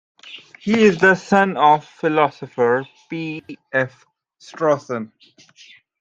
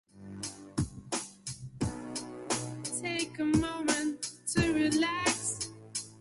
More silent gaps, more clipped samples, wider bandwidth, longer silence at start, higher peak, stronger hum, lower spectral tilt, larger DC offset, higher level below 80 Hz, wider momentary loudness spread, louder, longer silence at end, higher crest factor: neither; neither; second, 8 kHz vs 11.5 kHz; about the same, 0.25 s vs 0.15 s; first, -2 dBFS vs -14 dBFS; neither; first, -6 dB/octave vs -3.5 dB/octave; neither; second, -62 dBFS vs -52 dBFS; first, 18 LU vs 13 LU; first, -18 LUFS vs -33 LUFS; first, 0.95 s vs 0 s; about the same, 18 dB vs 20 dB